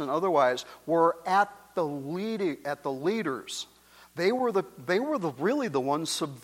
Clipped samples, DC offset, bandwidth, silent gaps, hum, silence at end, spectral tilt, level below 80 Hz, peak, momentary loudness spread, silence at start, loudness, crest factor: under 0.1%; under 0.1%; 16.5 kHz; none; none; 0.05 s; -4.5 dB/octave; -72 dBFS; -10 dBFS; 9 LU; 0 s; -28 LUFS; 18 dB